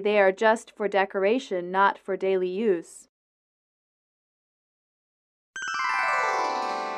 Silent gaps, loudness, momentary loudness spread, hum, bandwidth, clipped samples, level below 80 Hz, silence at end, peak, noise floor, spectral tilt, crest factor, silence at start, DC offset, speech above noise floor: 3.09-5.54 s; -25 LUFS; 7 LU; none; 11.5 kHz; under 0.1%; -78 dBFS; 0 s; -8 dBFS; under -90 dBFS; -4 dB/octave; 18 dB; 0 s; under 0.1%; over 66 dB